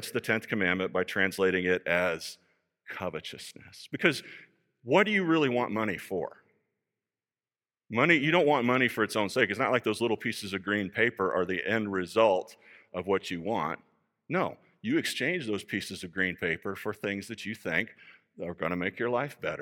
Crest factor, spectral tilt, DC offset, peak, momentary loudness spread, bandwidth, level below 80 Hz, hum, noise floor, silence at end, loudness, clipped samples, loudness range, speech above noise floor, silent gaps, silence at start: 24 dB; -5 dB/octave; under 0.1%; -6 dBFS; 14 LU; 17.5 kHz; -70 dBFS; none; under -90 dBFS; 0 s; -29 LUFS; under 0.1%; 6 LU; over 61 dB; none; 0 s